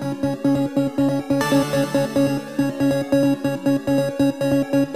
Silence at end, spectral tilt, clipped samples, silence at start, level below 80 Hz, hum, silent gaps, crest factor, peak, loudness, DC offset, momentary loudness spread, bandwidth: 0 s; -6.5 dB/octave; under 0.1%; 0 s; -52 dBFS; none; none; 14 dB; -6 dBFS; -20 LUFS; 0.3%; 3 LU; 15.5 kHz